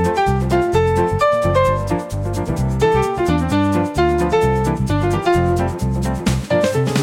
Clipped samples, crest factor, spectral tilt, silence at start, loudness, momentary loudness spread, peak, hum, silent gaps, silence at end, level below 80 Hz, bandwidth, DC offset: under 0.1%; 12 dB; -6.5 dB/octave; 0 s; -17 LUFS; 5 LU; -4 dBFS; none; none; 0 s; -30 dBFS; 16.5 kHz; under 0.1%